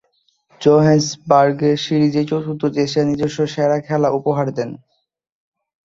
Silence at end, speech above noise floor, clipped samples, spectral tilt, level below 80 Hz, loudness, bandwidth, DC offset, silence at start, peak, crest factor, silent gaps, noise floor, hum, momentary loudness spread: 1.1 s; 46 dB; under 0.1%; -6.5 dB/octave; -56 dBFS; -17 LUFS; 7.8 kHz; under 0.1%; 0.6 s; -2 dBFS; 16 dB; none; -62 dBFS; none; 7 LU